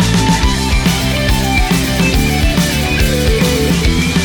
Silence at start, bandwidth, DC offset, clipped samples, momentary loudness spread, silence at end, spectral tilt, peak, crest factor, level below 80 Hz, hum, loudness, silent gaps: 0 s; over 20 kHz; under 0.1%; under 0.1%; 1 LU; 0 s; -4.5 dB/octave; -2 dBFS; 10 dB; -18 dBFS; none; -13 LUFS; none